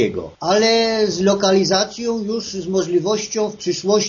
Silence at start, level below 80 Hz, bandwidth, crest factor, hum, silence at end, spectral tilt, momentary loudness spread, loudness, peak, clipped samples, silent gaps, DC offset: 0 s; -54 dBFS; 7.4 kHz; 16 dB; none; 0 s; -3.5 dB/octave; 8 LU; -18 LUFS; -2 dBFS; under 0.1%; none; under 0.1%